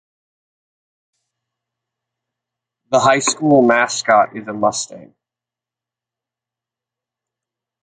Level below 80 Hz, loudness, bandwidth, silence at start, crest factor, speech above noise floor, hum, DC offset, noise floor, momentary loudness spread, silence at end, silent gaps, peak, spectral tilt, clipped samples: -64 dBFS; -15 LUFS; 9.6 kHz; 2.9 s; 20 dB; 73 dB; none; under 0.1%; -88 dBFS; 9 LU; 2.85 s; none; -2 dBFS; -3.5 dB/octave; under 0.1%